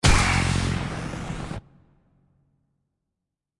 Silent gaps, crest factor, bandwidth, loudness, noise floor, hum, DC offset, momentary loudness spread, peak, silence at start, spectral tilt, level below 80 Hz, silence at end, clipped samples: none; 20 dB; 11.5 kHz; -25 LUFS; -84 dBFS; none; under 0.1%; 15 LU; -6 dBFS; 0.05 s; -4 dB/octave; -32 dBFS; 2 s; under 0.1%